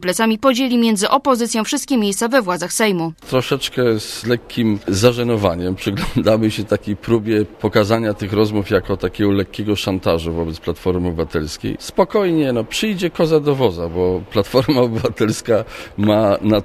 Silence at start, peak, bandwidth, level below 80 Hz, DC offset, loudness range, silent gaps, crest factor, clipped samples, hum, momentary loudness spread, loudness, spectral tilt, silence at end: 0 s; 0 dBFS; 15.5 kHz; -38 dBFS; under 0.1%; 2 LU; none; 18 dB; under 0.1%; none; 6 LU; -18 LUFS; -5 dB/octave; 0 s